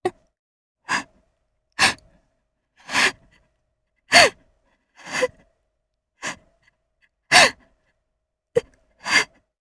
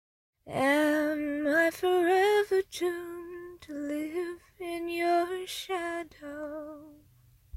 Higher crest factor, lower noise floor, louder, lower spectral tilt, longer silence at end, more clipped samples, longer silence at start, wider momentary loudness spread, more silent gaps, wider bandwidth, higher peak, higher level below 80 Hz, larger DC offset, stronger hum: first, 24 dB vs 18 dB; first, -78 dBFS vs -61 dBFS; first, -19 LUFS vs -29 LUFS; second, -1 dB/octave vs -4 dB/octave; first, 0.35 s vs 0 s; neither; second, 0.05 s vs 0.45 s; about the same, 19 LU vs 17 LU; first, 0.39-0.75 s vs none; second, 11 kHz vs 16 kHz; first, 0 dBFS vs -14 dBFS; first, -58 dBFS vs -66 dBFS; neither; neither